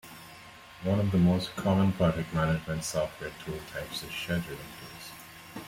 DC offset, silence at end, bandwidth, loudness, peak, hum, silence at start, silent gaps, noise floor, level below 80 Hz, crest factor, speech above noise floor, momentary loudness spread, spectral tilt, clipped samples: under 0.1%; 0 s; 16.5 kHz; -30 LUFS; -14 dBFS; none; 0.05 s; none; -50 dBFS; -54 dBFS; 16 dB; 20 dB; 20 LU; -6 dB/octave; under 0.1%